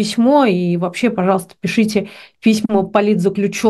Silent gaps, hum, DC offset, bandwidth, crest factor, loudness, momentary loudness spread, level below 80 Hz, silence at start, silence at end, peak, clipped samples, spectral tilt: none; none; under 0.1%; 12.5 kHz; 14 dB; -16 LUFS; 6 LU; -56 dBFS; 0 s; 0 s; 0 dBFS; under 0.1%; -6 dB/octave